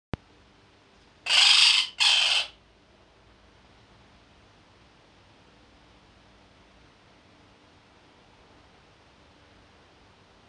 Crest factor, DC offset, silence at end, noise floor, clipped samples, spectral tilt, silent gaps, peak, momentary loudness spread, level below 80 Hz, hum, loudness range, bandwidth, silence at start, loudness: 24 dB; under 0.1%; 8 s; -58 dBFS; under 0.1%; 1 dB/octave; none; -6 dBFS; 23 LU; -60 dBFS; none; 9 LU; 10.5 kHz; 1.25 s; -19 LUFS